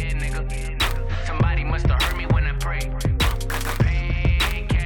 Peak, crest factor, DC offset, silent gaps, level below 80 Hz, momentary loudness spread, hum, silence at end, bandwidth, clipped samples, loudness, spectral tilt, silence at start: -8 dBFS; 14 dB; under 0.1%; none; -24 dBFS; 6 LU; none; 0 s; over 20 kHz; under 0.1%; -23 LUFS; -5 dB/octave; 0 s